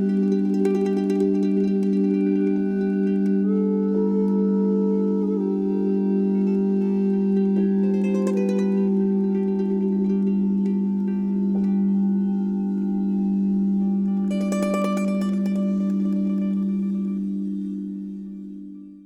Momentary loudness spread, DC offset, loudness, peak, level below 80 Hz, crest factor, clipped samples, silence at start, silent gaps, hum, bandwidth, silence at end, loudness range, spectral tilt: 4 LU; under 0.1%; -22 LUFS; -10 dBFS; -62 dBFS; 12 dB; under 0.1%; 0 s; none; none; 8.4 kHz; 0.05 s; 2 LU; -9.5 dB/octave